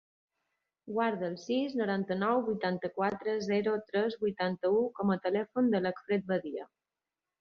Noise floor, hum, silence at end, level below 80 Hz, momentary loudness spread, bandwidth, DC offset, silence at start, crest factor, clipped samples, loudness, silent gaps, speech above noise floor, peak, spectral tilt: under -90 dBFS; none; 0.75 s; -74 dBFS; 5 LU; 6.8 kHz; under 0.1%; 0.85 s; 16 dB; under 0.1%; -32 LUFS; none; over 59 dB; -16 dBFS; -7 dB/octave